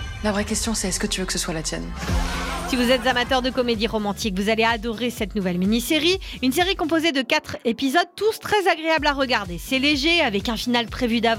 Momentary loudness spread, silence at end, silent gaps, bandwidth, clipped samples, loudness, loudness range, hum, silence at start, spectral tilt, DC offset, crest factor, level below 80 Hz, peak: 7 LU; 0 s; none; 16.5 kHz; under 0.1%; -22 LUFS; 2 LU; none; 0 s; -3.5 dB/octave; under 0.1%; 16 dB; -36 dBFS; -6 dBFS